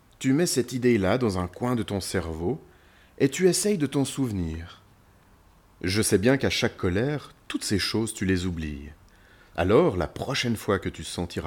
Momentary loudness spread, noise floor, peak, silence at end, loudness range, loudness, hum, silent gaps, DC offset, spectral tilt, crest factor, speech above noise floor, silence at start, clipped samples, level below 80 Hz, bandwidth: 12 LU; -57 dBFS; -8 dBFS; 0 s; 2 LU; -26 LUFS; none; none; under 0.1%; -5 dB/octave; 18 dB; 31 dB; 0.2 s; under 0.1%; -48 dBFS; 18.5 kHz